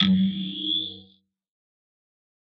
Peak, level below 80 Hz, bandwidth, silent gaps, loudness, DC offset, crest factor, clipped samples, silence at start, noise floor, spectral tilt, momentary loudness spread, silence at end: -8 dBFS; -66 dBFS; 5.8 kHz; none; -25 LUFS; under 0.1%; 20 dB; under 0.1%; 0 s; -59 dBFS; -7 dB/octave; 13 LU; 1.5 s